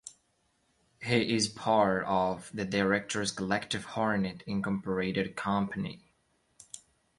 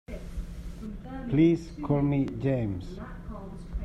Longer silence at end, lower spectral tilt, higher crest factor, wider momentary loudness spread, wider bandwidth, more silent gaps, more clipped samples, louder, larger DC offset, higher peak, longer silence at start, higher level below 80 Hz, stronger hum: first, 0.4 s vs 0 s; second, -4.5 dB/octave vs -9 dB/octave; about the same, 20 dB vs 18 dB; second, 14 LU vs 18 LU; first, 11.5 kHz vs 9.8 kHz; neither; neither; about the same, -30 LUFS vs -28 LUFS; neither; about the same, -12 dBFS vs -12 dBFS; about the same, 0.05 s vs 0.1 s; second, -62 dBFS vs -42 dBFS; neither